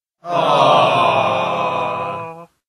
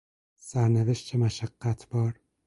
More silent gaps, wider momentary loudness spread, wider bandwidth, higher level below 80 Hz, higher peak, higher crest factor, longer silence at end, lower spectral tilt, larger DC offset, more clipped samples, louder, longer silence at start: neither; first, 13 LU vs 8 LU; about the same, 12 kHz vs 11.5 kHz; second, -62 dBFS vs -56 dBFS; first, 0 dBFS vs -12 dBFS; about the same, 16 dB vs 16 dB; about the same, 0.25 s vs 0.35 s; second, -5 dB/octave vs -7 dB/octave; neither; neither; first, -16 LUFS vs -28 LUFS; second, 0.25 s vs 0.45 s